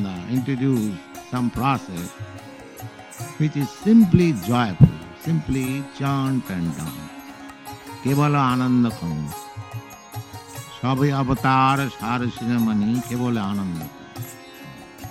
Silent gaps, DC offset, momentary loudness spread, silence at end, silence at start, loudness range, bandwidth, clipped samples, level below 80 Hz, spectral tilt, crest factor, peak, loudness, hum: none; under 0.1%; 20 LU; 0 s; 0 s; 6 LU; 16 kHz; under 0.1%; -46 dBFS; -7 dB/octave; 22 dB; 0 dBFS; -22 LUFS; none